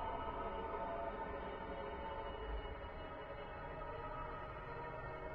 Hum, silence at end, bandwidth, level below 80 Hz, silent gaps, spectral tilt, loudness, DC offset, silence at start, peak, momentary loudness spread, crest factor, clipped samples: none; 0 s; 5.6 kHz; -54 dBFS; none; -4.5 dB/octave; -47 LUFS; under 0.1%; 0 s; -32 dBFS; 5 LU; 14 dB; under 0.1%